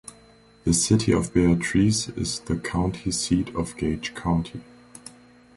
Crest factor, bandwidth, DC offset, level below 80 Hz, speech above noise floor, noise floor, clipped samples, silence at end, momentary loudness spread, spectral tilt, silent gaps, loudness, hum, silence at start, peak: 18 dB; 11.5 kHz; under 0.1%; -40 dBFS; 30 dB; -53 dBFS; under 0.1%; 0.45 s; 19 LU; -5 dB/octave; none; -24 LUFS; none; 0.65 s; -6 dBFS